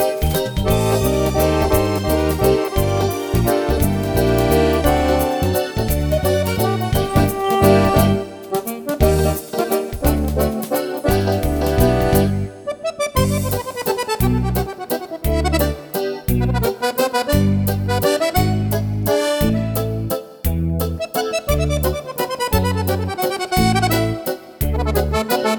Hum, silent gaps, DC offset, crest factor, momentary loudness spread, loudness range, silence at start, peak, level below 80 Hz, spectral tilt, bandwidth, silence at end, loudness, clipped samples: none; none; under 0.1%; 18 dB; 7 LU; 3 LU; 0 s; 0 dBFS; -26 dBFS; -6 dB/octave; 19.5 kHz; 0 s; -19 LUFS; under 0.1%